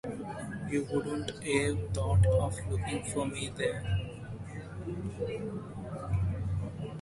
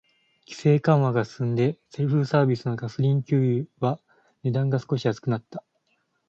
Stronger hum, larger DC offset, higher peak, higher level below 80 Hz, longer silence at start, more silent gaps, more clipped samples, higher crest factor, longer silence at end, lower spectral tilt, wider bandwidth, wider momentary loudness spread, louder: neither; neither; second, -14 dBFS vs -6 dBFS; first, -42 dBFS vs -64 dBFS; second, 0.05 s vs 0.5 s; neither; neither; about the same, 18 dB vs 18 dB; second, 0 s vs 0.7 s; second, -6 dB/octave vs -8.5 dB/octave; first, 11.5 kHz vs 7.6 kHz; first, 13 LU vs 10 LU; second, -33 LUFS vs -24 LUFS